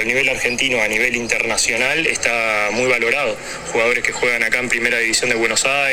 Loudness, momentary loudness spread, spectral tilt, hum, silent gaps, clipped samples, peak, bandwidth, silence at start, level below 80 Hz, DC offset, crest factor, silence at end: -16 LUFS; 2 LU; -1.5 dB/octave; none; none; under 0.1%; 0 dBFS; 17 kHz; 0 s; -46 dBFS; under 0.1%; 18 dB; 0 s